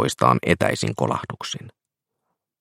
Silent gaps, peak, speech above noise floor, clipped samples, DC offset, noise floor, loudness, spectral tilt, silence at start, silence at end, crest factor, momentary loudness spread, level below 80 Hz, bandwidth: none; 0 dBFS; 60 dB; under 0.1%; under 0.1%; -82 dBFS; -22 LUFS; -5 dB/octave; 0 s; 0.9 s; 22 dB; 13 LU; -54 dBFS; 16.5 kHz